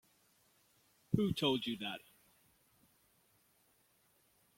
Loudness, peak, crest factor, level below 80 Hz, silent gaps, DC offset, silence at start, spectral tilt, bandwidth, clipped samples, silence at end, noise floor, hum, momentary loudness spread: -37 LUFS; -18 dBFS; 26 dB; -70 dBFS; none; under 0.1%; 1.1 s; -6 dB/octave; 16.5 kHz; under 0.1%; 2.6 s; -74 dBFS; none; 11 LU